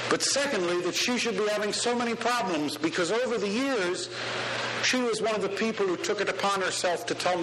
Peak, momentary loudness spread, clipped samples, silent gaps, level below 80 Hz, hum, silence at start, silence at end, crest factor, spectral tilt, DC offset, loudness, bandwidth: -10 dBFS; 4 LU; under 0.1%; none; -68 dBFS; none; 0 s; 0 s; 18 dB; -2.5 dB/octave; under 0.1%; -27 LUFS; 13 kHz